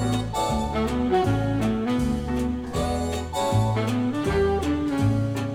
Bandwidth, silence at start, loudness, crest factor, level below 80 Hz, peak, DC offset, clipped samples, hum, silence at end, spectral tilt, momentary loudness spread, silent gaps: 15 kHz; 0 s; -24 LUFS; 14 dB; -36 dBFS; -10 dBFS; under 0.1%; under 0.1%; none; 0 s; -6.5 dB/octave; 4 LU; none